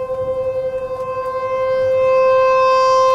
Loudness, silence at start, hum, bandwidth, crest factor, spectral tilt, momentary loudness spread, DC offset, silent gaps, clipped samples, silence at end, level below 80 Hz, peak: -16 LUFS; 0 s; none; 7.8 kHz; 10 dB; -3.5 dB/octave; 10 LU; under 0.1%; none; under 0.1%; 0 s; -48 dBFS; -6 dBFS